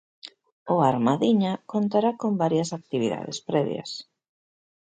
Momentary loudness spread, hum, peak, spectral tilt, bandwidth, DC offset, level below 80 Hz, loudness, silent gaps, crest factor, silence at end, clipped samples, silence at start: 17 LU; none; -6 dBFS; -6.5 dB/octave; 9.2 kHz; under 0.1%; -70 dBFS; -25 LUFS; 0.52-0.66 s; 18 dB; 0.8 s; under 0.1%; 0.25 s